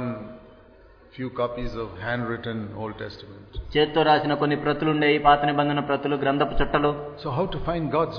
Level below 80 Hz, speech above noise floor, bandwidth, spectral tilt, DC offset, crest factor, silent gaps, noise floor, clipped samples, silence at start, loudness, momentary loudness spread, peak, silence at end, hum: -40 dBFS; 27 dB; 5.4 kHz; -8.5 dB/octave; under 0.1%; 18 dB; none; -51 dBFS; under 0.1%; 0 s; -24 LUFS; 16 LU; -6 dBFS; 0 s; none